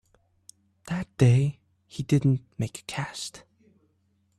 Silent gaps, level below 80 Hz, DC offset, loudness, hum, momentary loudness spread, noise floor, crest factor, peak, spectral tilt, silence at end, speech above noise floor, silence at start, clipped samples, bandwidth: none; -56 dBFS; under 0.1%; -27 LUFS; none; 16 LU; -69 dBFS; 20 dB; -8 dBFS; -6.5 dB/octave; 1 s; 45 dB; 0.85 s; under 0.1%; 12 kHz